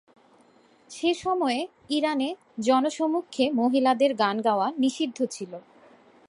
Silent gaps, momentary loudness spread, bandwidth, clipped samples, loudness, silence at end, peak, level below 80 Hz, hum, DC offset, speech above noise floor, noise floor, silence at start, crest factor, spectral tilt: none; 8 LU; 11.5 kHz; under 0.1%; -25 LUFS; 0.7 s; -8 dBFS; -72 dBFS; none; under 0.1%; 34 dB; -59 dBFS; 0.9 s; 18 dB; -4 dB/octave